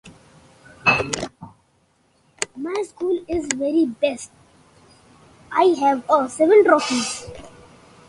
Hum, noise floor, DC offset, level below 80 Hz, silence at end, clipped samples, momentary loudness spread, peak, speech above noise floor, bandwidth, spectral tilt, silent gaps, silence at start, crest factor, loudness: none; -62 dBFS; under 0.1%; -54 dBFS; 0.6 s; under 0.1%; 17 LU; 0 dBFS; 43 dB; 11.5 kHz; -3.5 dB/octave; none; 0.05 s; 22 dB; -20 LUFS